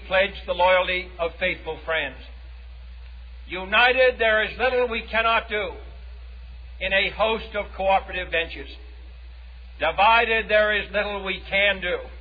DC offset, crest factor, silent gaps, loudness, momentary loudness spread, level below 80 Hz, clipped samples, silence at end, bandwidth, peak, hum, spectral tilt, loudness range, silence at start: under 0.1%; 16 dB; none; -22 LUFS; 24 LU; -40 dBFS; under 0.1%; 0 s; 5 kHz; -8 dBFS; none; -6.5 dB/octave; 4 LU; 0 s